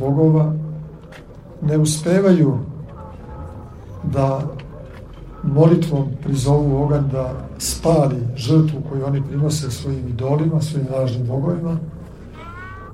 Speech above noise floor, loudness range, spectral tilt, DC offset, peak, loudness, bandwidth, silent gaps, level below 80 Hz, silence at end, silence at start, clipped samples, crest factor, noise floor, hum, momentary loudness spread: 21 dB; 4 LU; -7 dB/octave; under 0.1%; -2 dBFS; -19 LUFS; 14.5 kHz; none; -40 dBFS; 0 s; 0 s; under 0.1%; 16 dB; -38 dBFS; none; 22 LU